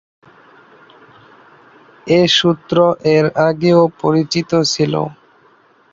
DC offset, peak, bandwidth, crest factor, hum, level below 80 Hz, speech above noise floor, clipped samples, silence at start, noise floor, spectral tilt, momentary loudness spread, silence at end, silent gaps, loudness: under 0.1%; 0 dBFS; 7.8 kHz; 16 dB; none; -56 dBFS; 38 dB; under 0.1%; 2.05 s; -51 dBFS; -5 dB/octave; 6 LU; 0.8 s; none; -14 LUFS